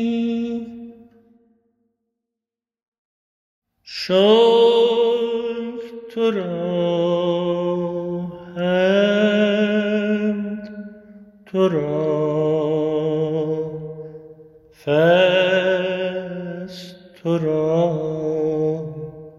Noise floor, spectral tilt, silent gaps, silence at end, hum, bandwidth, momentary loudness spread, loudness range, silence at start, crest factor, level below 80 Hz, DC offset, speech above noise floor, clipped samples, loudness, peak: -88 dBFS; -7 dB/octave; 2.88-2.92 s, 2.98-3.62 s; 0.1 s; none; 7.6 kHz; 18 LU; 5 LU; 0 s; 18 dB; -60 dBFS; under 0.1%; 71 dB; under 0.1%; -19 LUFS; -2 dBFS